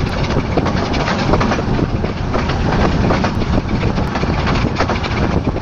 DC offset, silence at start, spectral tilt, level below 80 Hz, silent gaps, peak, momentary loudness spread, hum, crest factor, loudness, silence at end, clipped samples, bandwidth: under 0.1%; 0 s; -6.5 dB/octave; -24 dBFS; none; 0 dBFS; 3 LU; none; 14 dB; -17 LUFS; 0 s; under 0.1%; 8 kHz